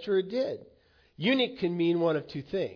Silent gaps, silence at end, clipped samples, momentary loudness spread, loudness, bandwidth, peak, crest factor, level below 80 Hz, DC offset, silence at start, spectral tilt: none; 0 s; under 0.1%; 8 LU; -29 LUFS; 5.4 kHz; -14 dBFS; 16 dB; -68 dBFS; under 0.1%; 0 s; -7.5 dB/octave